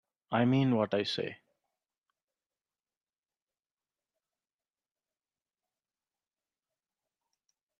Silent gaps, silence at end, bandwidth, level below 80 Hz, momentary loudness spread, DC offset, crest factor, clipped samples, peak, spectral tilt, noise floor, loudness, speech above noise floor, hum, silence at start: none; 6.45 s; 9.8 kHz; -78 dBFS; 9 LU; under 0.1%; 22 dB; under 0.1%; -16 dBFS; -7 dB/octave; under -90 dBFS; -30 LUFS; over 61 dB; none; 0.3 s